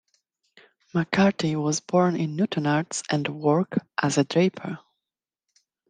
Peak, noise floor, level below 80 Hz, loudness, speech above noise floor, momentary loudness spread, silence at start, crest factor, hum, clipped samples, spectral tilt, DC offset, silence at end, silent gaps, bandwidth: -6 dBFS; -89 dBFS; -66 dBFS; -24 LUFS; 65 dB; 7 LU; 0.95 s; 20 dB; none; under 0.1%; -5.5 dB/octave; under 0.1%; 1.1 s; none; 10 kHz